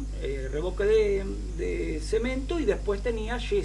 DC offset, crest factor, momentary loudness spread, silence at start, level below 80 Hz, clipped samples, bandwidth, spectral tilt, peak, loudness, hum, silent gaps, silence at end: under 0.1%; 16 dB; 9 LU; 0 s; -34 dBFS; under 0.1%; 11.5 kHz; -6 dB/octave; -12 dBFS; -28 LUFS; 50 Hz at -35 dBFS; none; 0 s